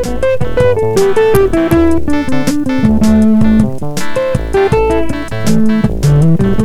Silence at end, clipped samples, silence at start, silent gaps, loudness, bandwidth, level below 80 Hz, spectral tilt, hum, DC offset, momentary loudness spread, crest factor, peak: 0 s; under 0.1%; 0 s; none; -12 LUFS; 15.5 kHz; -24 dBFS; -7 dB/octave; none; under 0.1%; 7 LU; 10 dB; 0 dBFS